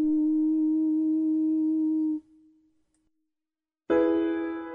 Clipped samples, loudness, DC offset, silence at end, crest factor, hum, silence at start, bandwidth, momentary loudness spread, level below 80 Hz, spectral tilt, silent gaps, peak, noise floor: under 0.1%; -26 LUFS; under 0.1%; 0 s; 14 dB; none; 0 s; 3.8 kHz; 5 LU; -64 dBFS; -8 dB/octave; none; -12 dBFS; under -90 dBFS